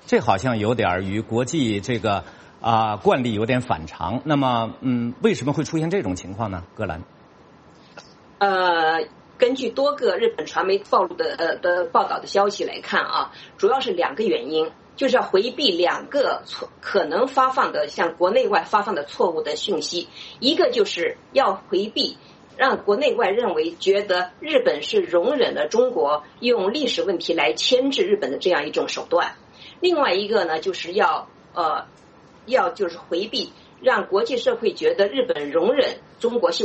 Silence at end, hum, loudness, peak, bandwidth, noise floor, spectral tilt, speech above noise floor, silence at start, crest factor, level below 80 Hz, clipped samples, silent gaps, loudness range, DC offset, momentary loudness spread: 0 s; none; -22 LUFS; -2 dBFS; 8.4 kHz; -49 dBFS; -4.5 dB/octave; 28 dB; 0.05 s; 20 dB; -58 dBFS; under 0.1%; none; 3 LU; under 0.1%; 8 LU